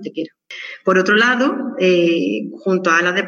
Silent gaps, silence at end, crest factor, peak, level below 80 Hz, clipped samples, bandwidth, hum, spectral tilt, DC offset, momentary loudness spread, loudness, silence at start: none; 0 s; 14 dB; -2 dBFS; -76 dBFS; under 0.1%; 7.2 kHz; none; -5 dB/octave; under 0.1%; 16 LU; -16 LUFS; 0 s